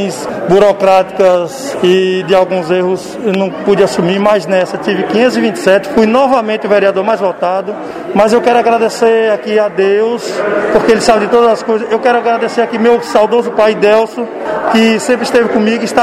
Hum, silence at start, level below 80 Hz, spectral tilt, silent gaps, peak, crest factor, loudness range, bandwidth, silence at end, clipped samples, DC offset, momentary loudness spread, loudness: none; 0 s; -48 dBFS; -5 dB/octave; none; 0 dBFS; 10 dB; 1 LU; 14.5 kHz; 0 s; 0.3%; under 0.1%; 6 LU; -11 LUFS